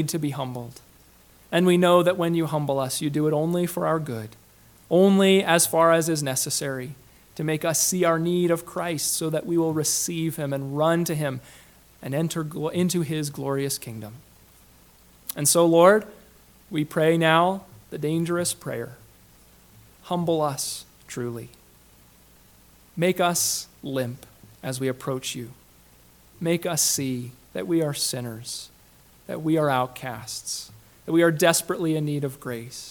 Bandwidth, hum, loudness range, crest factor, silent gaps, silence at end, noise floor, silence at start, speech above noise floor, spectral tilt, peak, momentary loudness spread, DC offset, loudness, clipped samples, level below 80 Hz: 19 kHz; none; 8 LU; 22 dB; none; 0 s; -54 dBFS; 0 s; 31 dB; -4.5 dB/octave; -2 dBFS; 17 LU; under 0.1%; -23 LUFS; under 0.1%; -60 dBFS